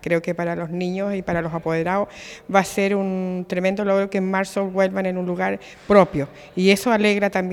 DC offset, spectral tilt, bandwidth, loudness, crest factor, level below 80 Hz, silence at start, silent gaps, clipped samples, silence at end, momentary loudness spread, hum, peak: under 0.1%; -6 dB/octave; 16.5 kHz; -21 LUFS; 20 dB; -52 dBFS; 0 s; none; under 0.1%; 0 s; 9 LU; none; 0 dBFS